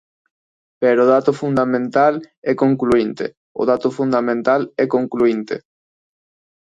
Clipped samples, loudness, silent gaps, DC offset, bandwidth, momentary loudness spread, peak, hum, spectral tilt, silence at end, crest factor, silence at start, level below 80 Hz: under 0.1%; -17 LUFS; 2.37-2.42 s, 3.37-3.55 s; under 0.1%; 9.2 kHz; 10 LU; -2 dBFS; none; -7.5 dB/octave; 1.05 s; 16 dB; 0.8 s; -56 dBFS